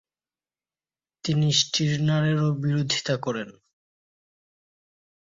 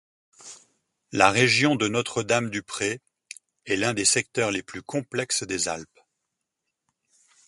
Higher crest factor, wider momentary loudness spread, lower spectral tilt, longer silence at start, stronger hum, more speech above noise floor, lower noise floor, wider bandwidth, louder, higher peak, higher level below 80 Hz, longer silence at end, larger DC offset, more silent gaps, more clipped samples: second, 20 dB vs 26 dB; second, 11 LU vs 25 LU; first, -4.5 dB/octave vs -3 dB/octave; first, 1.25 s vs 0.45 s; neither; first, over 66 dB vs 58 dB; first, under -90 dBFS vs -82 dBFS; second, 7.8 kHz vs 11.5 kHz; about the same, -24 LUFS vs -24 LUFS; second, -8 dBFS vs 0 dBFS; about the same, -62 dBFS vs -60 dBFS; about the same, 1.7 s vs 1.65 s; neither; neither; neither